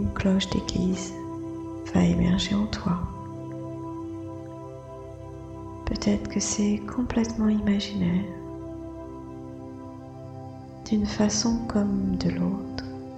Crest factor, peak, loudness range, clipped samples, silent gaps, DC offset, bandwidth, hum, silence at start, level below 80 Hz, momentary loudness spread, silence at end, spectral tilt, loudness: 20 dB; -6 dBFS; 7 LU; under 0.1%; none; under 0.1%; 8.8 kHz; none; 0 s; -42 dBFS; 17 LU; 0 s; -5.5 dB/octave; -27 LUFS